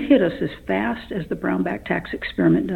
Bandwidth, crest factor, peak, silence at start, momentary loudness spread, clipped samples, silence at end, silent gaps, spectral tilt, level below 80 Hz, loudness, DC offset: 4.6 kHz; 18 dB; -4 dBFS; 0 s; 10 LU; under 0.1%; 0 s; none; -8.5 dB/octave; -46 dBFS; -23 LUFS; under 0.1%